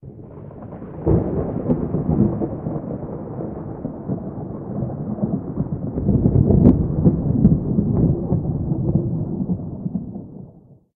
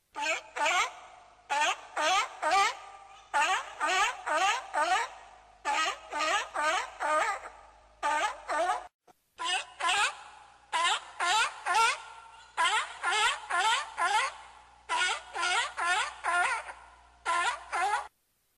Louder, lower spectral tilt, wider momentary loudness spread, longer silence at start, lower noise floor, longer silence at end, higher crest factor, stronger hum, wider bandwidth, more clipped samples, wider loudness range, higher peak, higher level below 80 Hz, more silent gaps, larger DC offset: first, -21 LUFS vs -29 LUFS; first, -14.5 dB/octave vs 1 dB/octave; first, 16 LU vs 10 LU; about the same, 0.05 s vs 0.15 s; second, -47 dBFS vs -68 dBFS; second, 0.2 s vs 0.5 s; first, 20 dB vs 14 dB; neither; second, 2.4 kHz vs 15 kHz; neither; first, 9 LU vs 3 LU; first, 0 dBFS vs -16 dBFS; first, -34 dBFS vs -68 dBFS; second, none vs 8.94-8.99 s; neither